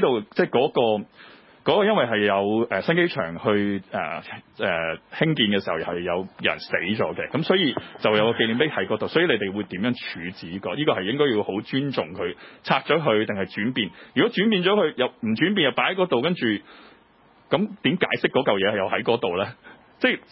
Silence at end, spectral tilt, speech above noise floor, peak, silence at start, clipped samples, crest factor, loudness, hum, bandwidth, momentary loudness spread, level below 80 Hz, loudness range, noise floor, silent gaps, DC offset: 0.1 s; -10 dB/octave; 33 dB; -4 dBFS; 0 s; under 0.1%; 20 dB; -23 LUFS; none; 5.8 kHz; 9 LU; -60 dBFS; 3 LU; -56 dBFS; none; under 0.1%